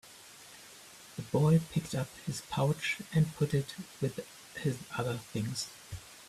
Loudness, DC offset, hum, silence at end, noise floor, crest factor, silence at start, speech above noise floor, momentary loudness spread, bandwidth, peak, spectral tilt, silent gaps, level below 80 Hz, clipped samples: -33 LUFS; under 0.1%; none; 0 s; -53 dBFS; 18 dB; 0.05 s; 21 dB; 21 LU; 14.5 kHz; -16 dBFS; -6 dB/octave; none; -62 dBFS; under 0.1%